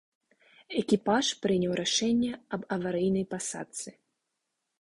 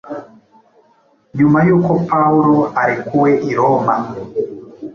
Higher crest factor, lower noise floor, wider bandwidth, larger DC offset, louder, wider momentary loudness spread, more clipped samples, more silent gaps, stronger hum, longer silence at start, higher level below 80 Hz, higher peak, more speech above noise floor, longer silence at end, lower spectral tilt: about the same, 18 dB vs 14 dB; first, -83 dBFS vs -54 dBFS; first, 11.5 kHz vs 6.8 kHz; neither; second, -29 LUFS vs -14 LUFS; second, 12 LU vs 16 LU; neither; neither; neither; first, 0.7 s vs 0.05 s; second, -64 dBFS vs -52 dBFS; second, -12 dBFS vs 0 dBFS; first, 54 dB vs 41 dB; first, 0.9 s vs 0 s; second, -4 dB/octave vs -9.5 dB/octave